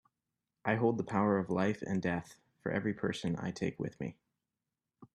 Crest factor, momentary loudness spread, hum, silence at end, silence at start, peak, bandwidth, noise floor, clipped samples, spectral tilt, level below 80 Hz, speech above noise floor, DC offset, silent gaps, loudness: 22 dB; 9 LU; none; 0.1 s; 0.65 s; -14 dBFS; 11 kHz; -90 dBFS; under 0.1%; -7 dB/octave; -68 dBFS; 56 dB; under 0.1%; none; -35 LUFS